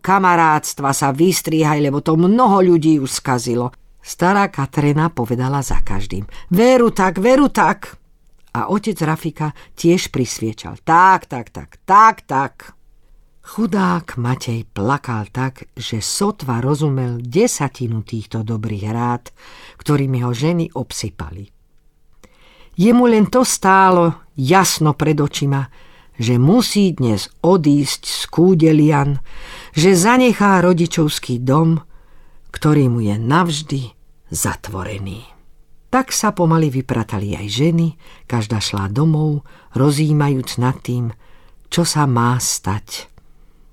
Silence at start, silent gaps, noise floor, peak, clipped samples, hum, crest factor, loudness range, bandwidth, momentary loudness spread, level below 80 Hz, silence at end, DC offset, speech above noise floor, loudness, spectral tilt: 0.05 s; none; -51 dBFS; 0 dBFS; under 0.1%; none; 16 dB; 7 LU; 16.5 kHz; 14 LU; -38 dBFS; 0.7 s; under 0.1%; 36 dB; -16 LUFS; -5.5 dB/octave